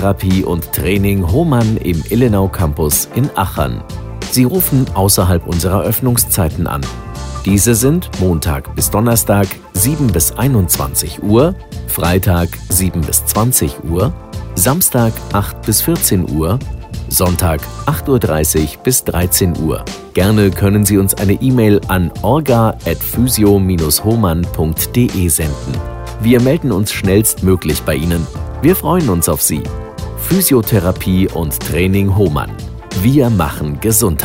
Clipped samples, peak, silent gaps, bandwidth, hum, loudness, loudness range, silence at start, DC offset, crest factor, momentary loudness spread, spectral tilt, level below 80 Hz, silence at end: under 0.1%; 0 dBFS; none; 16.5 kHz; none; -13 LUFS; 2 LU; 0 s; under 0.1%; 14 dB; 8 LU; -5 dB/octave; -26 dBFS; 0 s